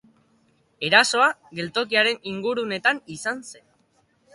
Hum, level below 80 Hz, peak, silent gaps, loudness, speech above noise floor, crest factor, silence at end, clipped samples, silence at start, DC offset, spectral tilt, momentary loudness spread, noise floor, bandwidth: none; -70 dBFS; -2 dBFS; none; -21 LUFS; 42 dB; 24 dB; 0.8 s; under 0.1%; 0.8 s; under 0.1%; -2.5 dB/octave; 13 LU; -65 dBFS; 11.5 kHz